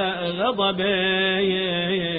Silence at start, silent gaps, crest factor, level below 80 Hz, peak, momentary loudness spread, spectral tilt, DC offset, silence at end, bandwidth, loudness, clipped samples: 0 s; none; 12 dB; -54 dBFS; -10 dBFS; 4 LU; -10 dB/octave; under 0.1%; 0 s; 4.9 kHz; -21 LUFS; under 0.1%